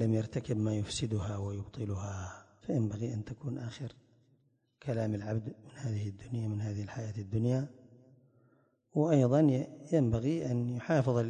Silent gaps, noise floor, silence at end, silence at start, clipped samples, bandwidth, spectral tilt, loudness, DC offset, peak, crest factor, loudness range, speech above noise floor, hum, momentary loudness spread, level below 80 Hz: none; -72 dBFS; 0 s; 0 s; under 0.1%; 9.8 kHz; -7.5 dB/octave; -34 LUFS; under 0.1%; -14 dBFS; 18 dB; 8 LU; 39 dB; none; 14 LU; -56 dBFS